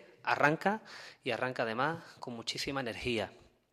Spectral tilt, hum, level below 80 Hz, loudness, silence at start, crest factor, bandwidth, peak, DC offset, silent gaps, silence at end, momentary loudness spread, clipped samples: -4.5 dB/octave; none; -64 dBFS; -34 LUFS; 0 s; 24 dB; 14.5 kHz; -12 dBFS; under 0.1%; none; 0.35 s; 14 LU; under 0.1%